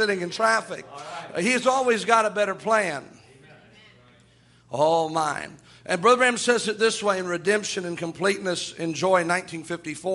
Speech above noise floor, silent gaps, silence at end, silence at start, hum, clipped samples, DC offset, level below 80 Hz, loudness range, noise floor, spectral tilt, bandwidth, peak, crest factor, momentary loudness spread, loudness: 33 dB; none; 0 s; 0 s; none; under 0.1%; under 0.1%; -68 dBFS; 4 LU; -56 dBFS; -3.5 dB/octave; 11.5 kHz; -4 dBFS; 22 dB; 13 LU; -23 LUFS